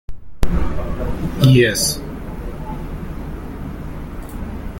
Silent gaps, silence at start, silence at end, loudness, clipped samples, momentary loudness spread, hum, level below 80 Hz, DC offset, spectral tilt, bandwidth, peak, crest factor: none; 0.1 s; 0 s; -21 LUFS; under 0.1%; 18 LU; none; -28 dBFS; under 0.1%; -5 dB/octave; 17 kHz; -2 dBFS; 18 dB